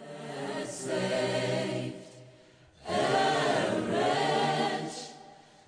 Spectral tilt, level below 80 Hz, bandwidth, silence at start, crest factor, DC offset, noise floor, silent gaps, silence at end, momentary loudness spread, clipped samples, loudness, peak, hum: -4.5 dB/octave; -68 dBFS; 10 kHz; 0 s; 16 dB; under 0.1%; -57 dBFS; none; 0.3 s; 16 LU; under 0.1%; -30 LUFS; -16 dBFS; none